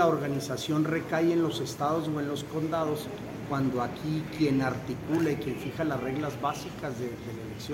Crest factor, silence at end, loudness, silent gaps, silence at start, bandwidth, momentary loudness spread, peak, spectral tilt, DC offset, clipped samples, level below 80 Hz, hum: 18 dB; 0 s; -30 LUFS; none; 0 s; 16.5 kHz; 9 LU; -12 dBFS; -6 dB/octave; under 0.1%; under 0.1%; -56 dBFS; none